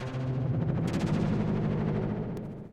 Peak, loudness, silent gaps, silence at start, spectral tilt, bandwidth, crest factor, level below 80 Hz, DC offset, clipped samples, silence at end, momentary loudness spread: -16 dBFS; -30 LUFS; none; 0 s; -8.5 dB/octave; 9.6 kHz; 12 dB; -46 dBFS; under 0.1%; under 0.1%; 0 s; 6 LU